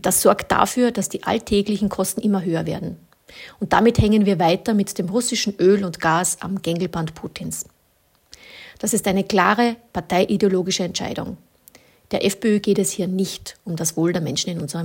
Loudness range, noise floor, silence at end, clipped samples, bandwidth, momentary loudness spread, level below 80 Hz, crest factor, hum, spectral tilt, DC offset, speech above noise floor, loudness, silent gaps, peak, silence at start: 4 LU; -61 dBFS; 0 s; under 0.1%; 17 kHz; 14 LU; -46 dBFS; 20 dB; none; -4.5 dB/octave; under 0.1%; 41 dB; -20 LUFS; none; 0 dBFS; 0.05 s